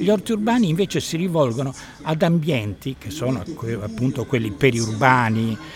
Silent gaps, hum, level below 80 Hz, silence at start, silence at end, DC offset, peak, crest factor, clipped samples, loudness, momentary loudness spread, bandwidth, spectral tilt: none; none; -48 dBFS; 0 s; 0 s; under 0.1%; 0 dBFS; 20 dB; under 0.1%; -21 LUFS; 10 LU; 17 kHz; -6 dB/octave